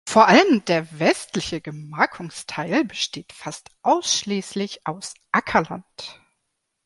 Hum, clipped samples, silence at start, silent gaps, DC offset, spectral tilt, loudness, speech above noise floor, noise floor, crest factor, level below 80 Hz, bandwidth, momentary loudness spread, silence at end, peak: none; under 0.1%; 0.05 s; none; under 0.1%; -3.5 dB/octave; -21 LUFS; 55 dB; -76 dBFS; 20 dB; -58 dBFS; 11.5 kHz; 19 LU; 0.75 s; -2 dBFS